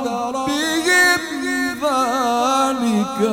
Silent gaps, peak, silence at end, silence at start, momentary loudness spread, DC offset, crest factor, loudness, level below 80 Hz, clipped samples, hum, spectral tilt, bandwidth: none; -4 dBFS; 0 s; 0 s; 8 LU; under 0.1%; 16 dB; -18 LUFS; -54 dBFS; under 0.1%; none; -3 dB/octave; 17 kHz